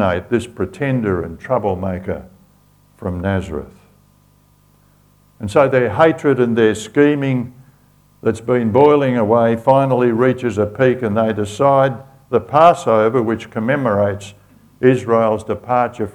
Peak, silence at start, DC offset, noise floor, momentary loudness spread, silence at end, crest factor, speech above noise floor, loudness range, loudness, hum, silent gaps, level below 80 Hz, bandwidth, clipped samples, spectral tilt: 0 dBFS; 0 s; under 0.1%; -53 dBFS; 11 LU; 0.05 s; 16 dB; 37 dB; 9 LU; -16 LUFS; 50 Hz at -45 dBFS; none; -48 dBFS; 19 kHz; under 0.1%; -7 dB/octave